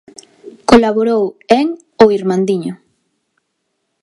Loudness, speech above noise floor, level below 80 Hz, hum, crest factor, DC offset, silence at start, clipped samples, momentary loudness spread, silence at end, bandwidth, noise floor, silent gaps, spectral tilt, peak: -13 LUFS; 56 dB; -44 dBFS; none; 14 dB; under 0.1%; 0.45 s; 0.1%; 10 LU; 1.25 s; 11.5 kHz; -70 dBFS; none; -6 dB/octave; 0 dBFS